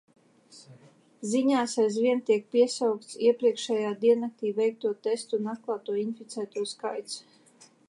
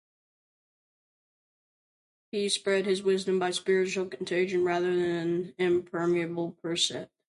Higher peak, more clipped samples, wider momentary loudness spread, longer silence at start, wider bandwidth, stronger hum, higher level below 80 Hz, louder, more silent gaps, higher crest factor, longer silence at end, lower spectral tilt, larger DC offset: about the same, -12 dBFS vs -12 dBFS; neither; first, 11 LU vs 6 LU; second, 0.55 s vs 2.35 s; about the same, 11.5 kHz vs 11.5 kHz; neither; second, -86 dBFS vs -72 dBFS; about the same, -28 LUFS vs -28 LUFS; neither; about the same, 18 dB vs 18 dB; first, 0.7 s vs 0.25 s; about the same, -4.5 dB/octave vs -4 dB/octave; neither